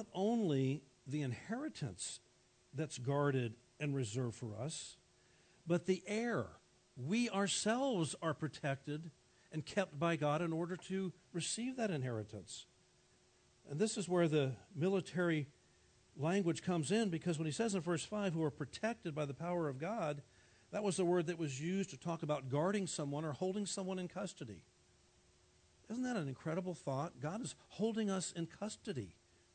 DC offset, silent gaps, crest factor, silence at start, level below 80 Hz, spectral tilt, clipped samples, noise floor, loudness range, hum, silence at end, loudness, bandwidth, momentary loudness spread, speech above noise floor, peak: under 0.1%; none; 18 dB; 0 s; -78 dBFS; -5.5 dB/octave; under 0.1%; -71 dBFS; 5 LU; none; 0.45 s; -40 LUFS; 9.4 kHz; 11 LU; 32 dB; -22 dBFS